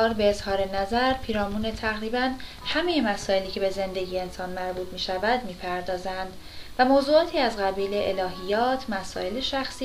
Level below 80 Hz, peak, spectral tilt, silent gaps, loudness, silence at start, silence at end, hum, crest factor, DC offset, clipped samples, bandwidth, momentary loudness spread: -44 dBFS; -8 dBFS; -4.5 dB/octave; none; -26 LUFS; 0 s; 0 s; none; 18 dB; under 0.1%; under 0.1%; 15.5 kHz; 10 LU